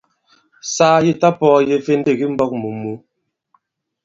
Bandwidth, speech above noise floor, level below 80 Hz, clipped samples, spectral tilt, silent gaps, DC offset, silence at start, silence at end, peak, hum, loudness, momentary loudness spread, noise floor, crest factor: 7.8 kHz; 47 dB; -58 dBFS; under 0.1%; -5.5 dB/octave; none; under 0.1%; 0.65 s; 1.05 s; 0 dBFS; none; -16 LUFS; 15 LU; -62 dBFS; 18 dB